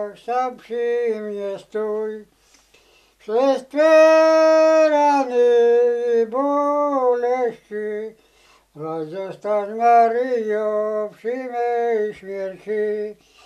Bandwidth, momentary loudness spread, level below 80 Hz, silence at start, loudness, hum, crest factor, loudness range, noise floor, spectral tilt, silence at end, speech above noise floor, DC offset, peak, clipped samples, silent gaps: 11.5 kHz; 15 LU; -68 dBFS; 0 s; -19 LUFS; none; 16 dB; 9 LU; -55 dBFS; -4.5 dB/octave; 0.35 s; 37 dB; under 0.1%; -4 dBFS; under 0.1%; none